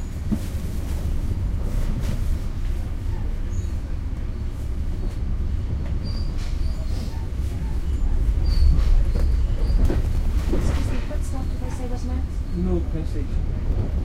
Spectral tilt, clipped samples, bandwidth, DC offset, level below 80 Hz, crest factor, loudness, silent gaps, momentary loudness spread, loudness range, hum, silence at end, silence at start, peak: -7.5 dB/octave; under 0.1%; 12 kHz; under 0.1%; -22 dBFS; 16 dB; -27 LUFS; none; 7 LU; 6 LU; none; 0 s; 0 s; -6 dBFS